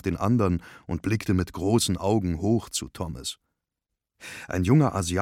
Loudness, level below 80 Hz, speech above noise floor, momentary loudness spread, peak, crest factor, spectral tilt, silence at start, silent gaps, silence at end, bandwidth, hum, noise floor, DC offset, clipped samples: -26 LUFS; -46 dBFS; 60 dB; 14 LU; -8 dBFS; 18 dB; -5.5 dB/octave; 0.05 s; none; 0 s; 16.5 kHz; none; -85 dBFS; under 0.1%; under 0.1%